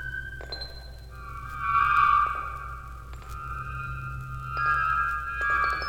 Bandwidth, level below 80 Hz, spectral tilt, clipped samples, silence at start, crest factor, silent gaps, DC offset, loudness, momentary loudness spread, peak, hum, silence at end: 17.5 kHz; -42 dBFS; -4.5 dB/octave; under 0.1%; 0 s; 18 dB; none; under 0.1%; -27 LUFS; 20 LU; -10 dBFS; none; 0 s